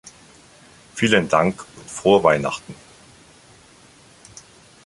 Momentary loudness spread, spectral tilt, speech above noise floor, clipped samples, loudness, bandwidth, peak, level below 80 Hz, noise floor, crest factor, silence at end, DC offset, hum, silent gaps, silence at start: 26 LU; -4.5 dB/octave; 31 dB; under 0.1%; -19 LUFS; 11.5 kHz; -2 dBFS; -54 dBFS; -50 dBFS; 22 dB; 2.1 s; under 0.1%; none; none; 0.05 s